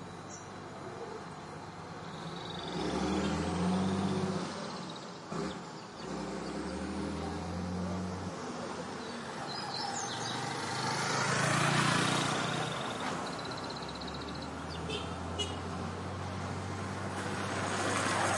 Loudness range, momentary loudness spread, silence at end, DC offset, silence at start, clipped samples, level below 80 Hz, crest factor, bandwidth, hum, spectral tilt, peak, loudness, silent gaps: 7 LU; 13 LU; 0 s; under 0.1%; 0 s; under 0.1%; -60 dBFS; 20 dB; 11.5 kHz; none; -4 dB/octave; -16 dBFS; -36 LUFS; none